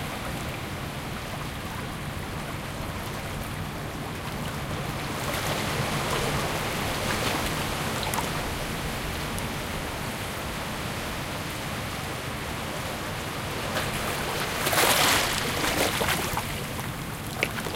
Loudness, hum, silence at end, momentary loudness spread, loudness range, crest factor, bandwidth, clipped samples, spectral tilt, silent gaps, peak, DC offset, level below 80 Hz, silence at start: -28 LUFS; none; 0 s; 9 LU; 9 LU; 24 dB; 17 kHz; under 0.1%; -3.5 dB/octave; none; -6 dBFS; under 0.1%; -42 dBFS; 0 s